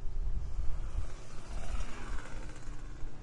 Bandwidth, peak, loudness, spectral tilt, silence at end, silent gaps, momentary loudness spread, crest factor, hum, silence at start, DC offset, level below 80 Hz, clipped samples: 10 kHz; -18 dBFS; -44 LUFS; -5.5 dB/octave; 0 s; none; 7 LU; 14 dB; none; 0 s; under 0.1%; -38 dBFS; under 0.1%